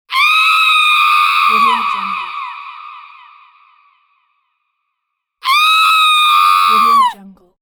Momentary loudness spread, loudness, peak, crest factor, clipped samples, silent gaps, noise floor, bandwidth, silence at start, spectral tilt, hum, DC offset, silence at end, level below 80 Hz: 15 LU; -10 LUFS; -2 dBFS; 12 dB; under 0.1%; none; -74 dBFS; over 20 kHz; 0.1 s; 1 dB/octave; none; under 0.1%; 0.3 s; -64 dBFS